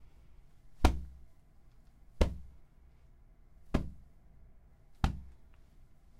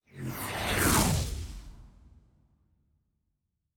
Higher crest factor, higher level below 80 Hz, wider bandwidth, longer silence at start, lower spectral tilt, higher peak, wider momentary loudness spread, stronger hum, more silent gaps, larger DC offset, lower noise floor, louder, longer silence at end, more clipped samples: first, 32 dB vs 22 dB; about the same, -40 dBFS vs -42 dBFS; second, 15 kHz vs over 20 kHz; second, 0 s vs 0.15 s; first, -6.5 dB/octave vs -3.5 dB/octave; first, -6 dBFS vs -10 dBFS; first, 26 LU vs 18 LU; neither; neither; neither; second, -59 dBFS vs -81 dBFS; second, -36 LUFS vs -28 LUFS; second, 0.35 s vs 1.7 s; neither